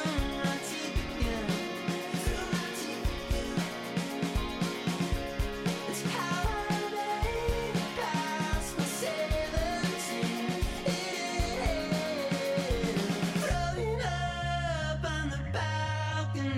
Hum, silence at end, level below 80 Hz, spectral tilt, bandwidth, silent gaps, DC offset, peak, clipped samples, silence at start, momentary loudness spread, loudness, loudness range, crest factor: none; 0 s; -40 dBFS; -5 dB/octave; 16 kHz; none; under 0.1%; -20 dBFS; under 0.1%; 0 s; 3 LU; -32 LUFS; 2 LU; 12 dB